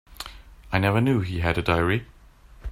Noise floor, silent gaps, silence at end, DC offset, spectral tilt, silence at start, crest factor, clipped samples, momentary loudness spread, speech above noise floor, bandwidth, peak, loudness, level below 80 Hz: -49 dBFS; none; 0 s; under 0.1%; -7 dB/octave; 0.1 s; 18 dB; under 0.1%; 18 LU; 27 dB; 16 kHz; -6 dBFS; -24 LUFS; -42 dBFS